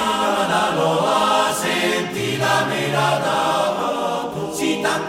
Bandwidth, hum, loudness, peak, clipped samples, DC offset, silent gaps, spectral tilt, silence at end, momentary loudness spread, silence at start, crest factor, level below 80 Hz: 16.5 kHz; none; -19 LUFS; -4 dBFS; under 0.1%; under 0.1%; none; -3.5 dB/octave; 0 s; 5 LU; 0 s; 14 dB; -54 dBFS